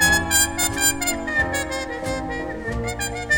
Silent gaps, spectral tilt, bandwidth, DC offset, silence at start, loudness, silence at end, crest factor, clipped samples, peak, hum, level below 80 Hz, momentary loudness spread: none; -2 dB/octave; 19.5 kHz; under 0.1%; 0 s; -21 LUFS; 0 s; 16 dB; under 0.1%; -6 dBFS; none; -36 dBFS; 10 LU